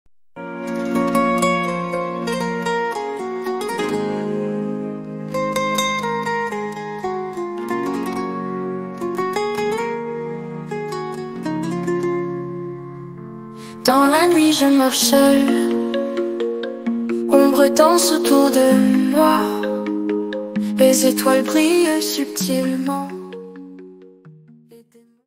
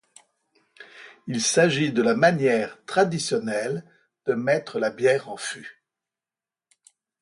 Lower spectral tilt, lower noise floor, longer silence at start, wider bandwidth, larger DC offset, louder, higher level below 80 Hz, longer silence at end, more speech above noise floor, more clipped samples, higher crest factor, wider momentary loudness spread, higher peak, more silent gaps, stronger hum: about the same, -4 dB/octave vs -4 dB/octave; second, -51 dBFS vs under -90 dBFS; second, 0.35 s vs 0.8 s; first, 16.5 kHz vs 11.5 kHz; neither; first, -19 LUFS vs -23 LUFS; first, -62 dBFS vs -70 dBFS; second, 0.5 s vs 1.5 s; second, 36 dB vs over 67 dB; neither; about the same, 18 dB vs 20 dB; about the same, 15 LU vs 16 LU; first, 0 dBFS vs -6 dBFS; neither; neither